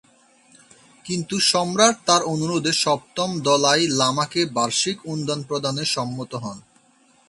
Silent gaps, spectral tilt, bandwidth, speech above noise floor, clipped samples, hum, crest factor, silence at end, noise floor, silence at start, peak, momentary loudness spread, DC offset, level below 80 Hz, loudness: none; -3 dB/octave; 11.5 kHz; 36 dB; under 0.1%; none; 22 dB; 0.7 s; -58 dBFS; 1.05 s; 0 dBFS; 12 LU; under 0.1%; -64 dBFS; -21 LUFS